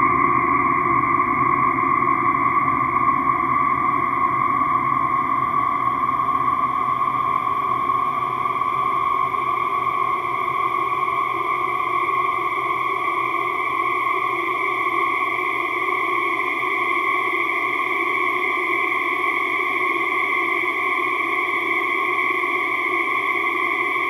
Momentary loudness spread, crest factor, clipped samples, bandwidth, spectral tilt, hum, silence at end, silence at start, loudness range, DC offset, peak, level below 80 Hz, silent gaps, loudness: 3 LU; 16 dB; under 0.1%; 14 kHz; -5 dB/octave; none; 0 s; 0 s; 3 LU; under 0.1%; -6 dBFS; -54 dBFS; none; -20 LUFS